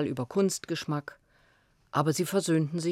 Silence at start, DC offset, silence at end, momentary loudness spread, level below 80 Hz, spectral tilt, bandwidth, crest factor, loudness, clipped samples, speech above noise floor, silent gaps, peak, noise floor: 0 s; under 0.1%; 0 s; 8 LU; -70 dBFS; -5.5 dB/octave; 16.5 kHz; 18 dB; -29 LUFS; under 0.1%; 37 dB; none; -12 dBFS; -66 dBFS